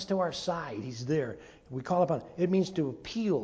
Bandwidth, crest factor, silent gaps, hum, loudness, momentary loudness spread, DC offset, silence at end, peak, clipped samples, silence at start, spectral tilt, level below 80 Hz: 8 kHz; 18 dB; none; none; -31 LUFS; 11 LU; under 0.1%; 0 s; -14 dBFS; under 0.1%; 0 s; -6.5 dB/octave; -62 dBFS